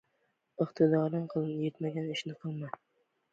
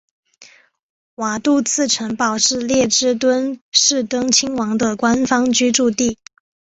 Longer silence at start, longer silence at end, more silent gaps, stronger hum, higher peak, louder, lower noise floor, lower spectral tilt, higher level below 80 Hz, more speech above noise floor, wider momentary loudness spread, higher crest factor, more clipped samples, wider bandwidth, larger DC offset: first, 0.6 s vs 0.4 s; about the same, 0.6 s vs 0.5 s; second, none vs 0.83-1.17 s, 3.61-3.72 s; neither; second, -14 dBFS vs -2 dBFS; second, -33 LUFS vs -16 LUFS; first, -77 dBFS vs -48 dBFS; first, -7.5 dB/octave vs -2 dB/octave; second, -78 dBFS vs -54 dBFS; first, 45 dB vs 31 dB; first, 15 LU vs 6 LU; about the same, 20 dB vs 16 dB; neither; about the same, 7.8 kHz vs 8.2 kHz; neither